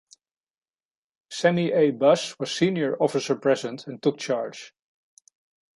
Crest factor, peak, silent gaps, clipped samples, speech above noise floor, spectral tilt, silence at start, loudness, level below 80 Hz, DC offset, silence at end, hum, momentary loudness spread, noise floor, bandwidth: 20 dB; -6 dBFS; none; under 0.1%; over 67 dB; -5 dB/octave; 1.3 s; -24 LUFS; -74 dBFS; under 0.1%; 1.05 s; none; 11 LU; under -90 dBFS; 11.5 kHz